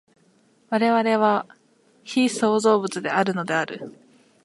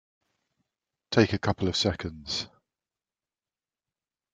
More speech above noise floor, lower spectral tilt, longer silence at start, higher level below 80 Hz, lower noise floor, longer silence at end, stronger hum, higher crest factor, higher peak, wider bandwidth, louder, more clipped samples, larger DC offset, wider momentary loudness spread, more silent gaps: second, 39 dB vs over 63 dB; about the same, -4.5 dB/octave vs -5 dB/octave; second, 0.7 s vs 1.1 s; second, -76 dBFS vs -58 dBFS; second, -60 dBFS vs under -90 dBFS; second, 0.55 s vs 1.85 s; neither; second, 18 dB vs 26 dB; about the same, -6 dBFS vs -6 dBFS; first, 11.5 kHz vs 9.4 kHz; first, -22 LUFS vs -27 LUFS; neither; neither; about the same, 12 LU vs 10 LU; neither